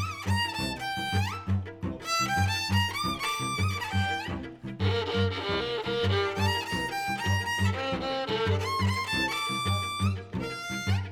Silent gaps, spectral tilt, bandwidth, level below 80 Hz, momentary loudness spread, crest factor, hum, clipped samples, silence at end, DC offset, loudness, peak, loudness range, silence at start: none; -4.5 dB/octave; 15 kHz; -52 dBFS; 6 LU; 16 dB; none; under 0.1%; 0 s; under 0.1%; -29 LUFS; -14 dBFS; 1 LU; 0 s